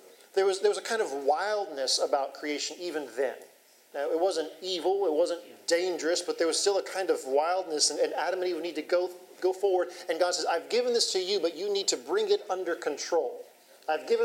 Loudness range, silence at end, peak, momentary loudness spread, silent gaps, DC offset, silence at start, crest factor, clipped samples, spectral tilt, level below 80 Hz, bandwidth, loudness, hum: 3 LU; 0 s; -10 dBFS; 7 LU; none; under 0.1%; 0.05 s; 20 dB; under 0.1%; -1 dB/octave; under -90 dBFS; 16 kHz; -29 LUFS; none